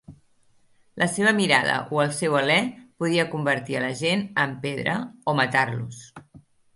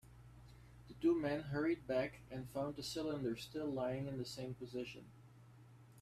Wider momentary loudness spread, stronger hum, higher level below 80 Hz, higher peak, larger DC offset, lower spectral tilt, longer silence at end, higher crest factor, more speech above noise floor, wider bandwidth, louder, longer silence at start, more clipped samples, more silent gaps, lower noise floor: second, 8 LU vs 24 LU; neither; about the same, -64 dBFS vs -66 dBFS; first, -2 dBFS vs -24 dBFS; neither; second, -4.5 dB/octave vs -6 dB/octave; first, 0.4 s vs 0 s; about the same, 22 dB vs 18 dB; first, 36 dB vs 20 dB; second, 11.5 kHz vs 14.5 kHz; first, -23 LUFS vs -42 LUFS; about the same, 0.1 s vs 0.05 s; neither; neither; about the same, -60 dBFS vs -61 dBFS